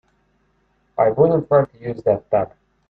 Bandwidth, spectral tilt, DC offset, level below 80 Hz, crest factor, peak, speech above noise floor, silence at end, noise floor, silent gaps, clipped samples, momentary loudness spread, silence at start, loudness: 4.5 kHz; -11 dB/octave; under 0.1%; -54 dBFS; 18 dB; -2 dBFS; 46 dB; 0.45 s; -64 dBFS; none; under 0.1%; 12 LU; 1 s; -19 LUFS